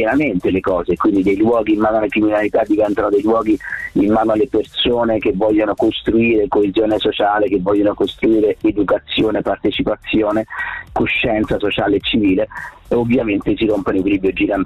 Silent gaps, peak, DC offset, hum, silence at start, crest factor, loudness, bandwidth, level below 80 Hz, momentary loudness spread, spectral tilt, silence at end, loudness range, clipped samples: none; -8 dBFS; under 0.1%; none; 0 s; 8 dB; -16 LUFS; 8.4 kHz; -40 dBFS; 4 LU; -7 dB/octave; 0 s; 2 LU; under 0.1%